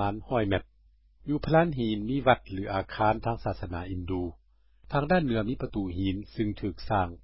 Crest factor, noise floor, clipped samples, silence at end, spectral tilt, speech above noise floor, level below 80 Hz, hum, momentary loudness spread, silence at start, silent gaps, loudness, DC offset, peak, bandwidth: 22 dB; -61 dBFS; under 0.1%; 0 s; -11 dB/octave; 33 dB; -44 dBFS; none; 9 LU; 0 s; none; -29 LUFS; 0.4%; -6 dBFS; 5.8 kHz